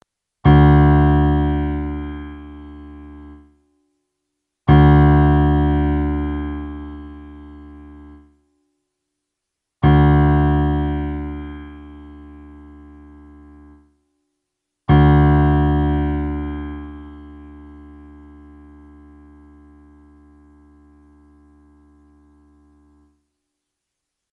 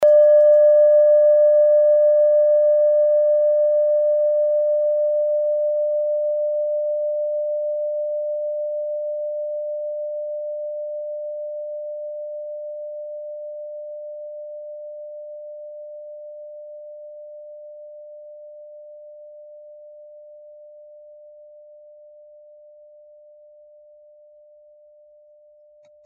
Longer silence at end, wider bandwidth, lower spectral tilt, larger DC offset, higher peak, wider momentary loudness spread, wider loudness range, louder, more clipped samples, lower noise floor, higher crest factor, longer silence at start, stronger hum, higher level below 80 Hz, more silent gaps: first, 6.75 s vs 5.25 s; first, 4 kHz vs 1.8 kHz; first, -11 dB/octave vs 2.5 dB/octave; neither; first, -2 dBFS vs -8 dBFS; about the same, 27 LU vs 25 LU; second, 17 LU vs 25 LU; first, -16 LUFS vs -19 LUFS; neither; first, -81 dBFS vs -52 dBFS; about the same, 18 dB vs 14 dB; first, 0.45 s vs 0 s; neither; first, -26 dBFS vs -82 dBFS; neither